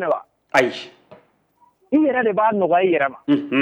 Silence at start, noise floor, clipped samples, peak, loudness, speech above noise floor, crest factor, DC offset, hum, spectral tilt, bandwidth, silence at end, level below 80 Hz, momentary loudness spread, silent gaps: 0 s; -59 dBFS; under 0.1%; -6 dBFS; -19 LUFS; 41 dB; 14 dB; under 0.1%; none; -5.5 dB/octave; 11 kHz; 0 s; -66 dBFS; 8 LU; none